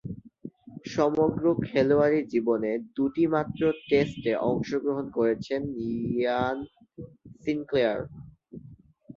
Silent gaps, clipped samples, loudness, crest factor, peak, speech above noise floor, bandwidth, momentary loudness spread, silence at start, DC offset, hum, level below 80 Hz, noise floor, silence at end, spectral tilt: none; under 0.1%; -27 LUFS; 18 dB; -10 dBFS; 25 dB; 7.4 kHz; 22 LU; 0.05 s; under 0.1%; none; -58 dBFS; -51 dBFS; 0.05 s; -7.5 dB/octave